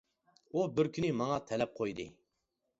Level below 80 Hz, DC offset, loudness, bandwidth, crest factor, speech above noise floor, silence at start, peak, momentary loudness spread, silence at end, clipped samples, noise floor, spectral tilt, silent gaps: -66 dBFS; under 0.1%; -35 LUFS; 7.6 kHz; 18 dB; 50 dB; 0.55 s; -18 dBFS; 8 LU; 0.7 s; under 0.1%; -84 dBFS; -6 dB/octave; none